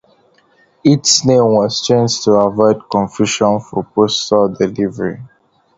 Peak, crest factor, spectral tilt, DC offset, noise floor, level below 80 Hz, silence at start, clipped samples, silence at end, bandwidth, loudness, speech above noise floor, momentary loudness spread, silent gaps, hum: 0 dBFS; 14 dB; -4.5 dB/octave; under 0.1%; -53 dBFS; -52 dBFS; 0.85 s; under 0.1%; 0.5 s; 7.8 kHz; -14 LUFS; 40 dB; 9 LU; none; none